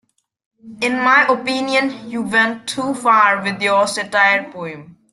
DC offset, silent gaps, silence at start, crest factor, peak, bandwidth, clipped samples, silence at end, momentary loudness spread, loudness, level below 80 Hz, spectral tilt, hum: under 0.1%; none; 0.65 s; 16 dB; -2 dBFS; 12.5 kHz; under 0.1%; 0.2 s; 12 LU; -16 LUFS; -64 dBFS; -3 dB/octave; none